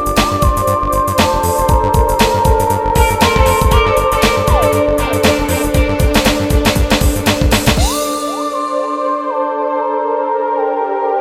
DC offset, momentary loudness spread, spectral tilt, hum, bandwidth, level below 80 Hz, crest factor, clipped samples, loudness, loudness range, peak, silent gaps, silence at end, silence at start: under 0.1%; 6 LU; -4.5 dB/octave; none; 16.5 kHz; -20 dBFS; 12 dB; under 0.1%; -13 LUFS; 4 LU; 0 dBFS; none; 0 s; 0 s